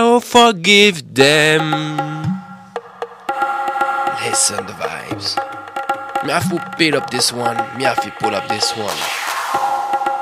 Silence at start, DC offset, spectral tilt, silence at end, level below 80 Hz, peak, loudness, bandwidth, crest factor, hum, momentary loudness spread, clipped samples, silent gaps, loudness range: 0 s; under 0.1%; -3 dB/octave; 0 s; -58 dBFS; 0 dBFS; -16 LUFS; 16 kHz; 16 dB; none; 14 LU; under 0.1%; none; 6 LU